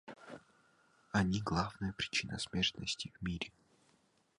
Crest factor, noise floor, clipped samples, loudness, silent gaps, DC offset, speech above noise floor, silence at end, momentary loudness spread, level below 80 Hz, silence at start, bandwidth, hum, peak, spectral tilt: 22 dB; -73 dBFS; under 0.1%; -37 LUFS; none; under 0.1%; 36 dB; 0.9 s; 18 LU; -56 dBFS; 0.05 s; 11.5 kHz; none; -16 dBFS; -4 dB/octave